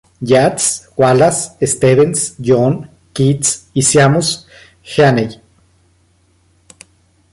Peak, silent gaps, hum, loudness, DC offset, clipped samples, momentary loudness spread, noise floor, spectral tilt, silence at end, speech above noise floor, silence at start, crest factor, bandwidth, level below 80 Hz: 0 dBFS; none; none; -13 LUFS; under 0.1%; under 0.1%; 8 LU; -55 dBFS; -4.5 dB/octave; 2 s; 42 dB; 0.2 s; 14 dB; 11.5 kHz; -48 dBFS